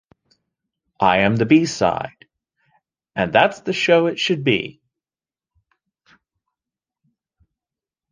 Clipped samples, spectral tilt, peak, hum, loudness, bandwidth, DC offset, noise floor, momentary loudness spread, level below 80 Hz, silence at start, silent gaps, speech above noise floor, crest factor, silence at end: under 0.1%; -5 dB/octave; 0 dBFS; none; -18 LUFS; 9.8 kHz; under 0.1%; under -90 dBFS; 12 LU; -54 dBFS; 1 s; none; over 73 dB; 22 dB; 3.4 s